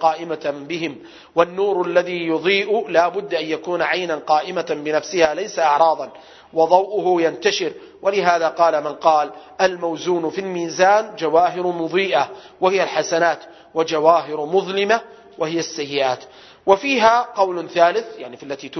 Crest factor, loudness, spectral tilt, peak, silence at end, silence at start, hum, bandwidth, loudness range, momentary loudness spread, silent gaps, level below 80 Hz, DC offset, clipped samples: 20 dB; -19 LUFS; -4 dB/octave; 0 dBFS; 0 s; 0 s; none; 6.4 kHz; 2 LU; 10 LU; none; -64 dBFS; under 0.1%; under 0.1%